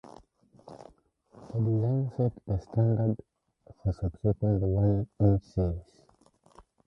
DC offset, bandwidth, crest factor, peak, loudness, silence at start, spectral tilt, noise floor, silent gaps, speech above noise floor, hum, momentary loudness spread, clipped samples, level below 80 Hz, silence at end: under 0.1%; 5.8 kHz; 20 dB; -10 dBFS; -29 LUFS; 0.05 s; -11.5 dB/octave; -63 dBFS; none; 36 dB; none; 11 LU; under 0.1%; -44 dBFS; 1.05 s